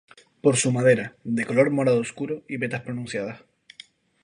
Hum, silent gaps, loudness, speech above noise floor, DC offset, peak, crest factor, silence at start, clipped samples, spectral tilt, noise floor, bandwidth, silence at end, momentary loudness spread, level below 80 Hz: none; none; -24 LUFS; 28 dB; under 0.1%; -4 dBFS; 20 dB; 0.45 s; under 0.1%; -5 dB/octave; -51 dBFS; 11 kHz; 0.85 s; 11 LU; -66 dBFS